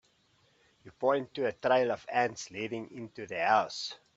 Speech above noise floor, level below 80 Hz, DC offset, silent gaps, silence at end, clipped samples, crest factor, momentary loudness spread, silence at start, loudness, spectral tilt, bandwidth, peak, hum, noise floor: 38 dB; -76 dBFS; under 0.1%; none; 0.2 s; under 0.1%; 20 dB; 12 LU; 0.85 s; -31 LUFS; -4 dB/octave; 8 kHz; -12 dBFS; none; -69 dBFS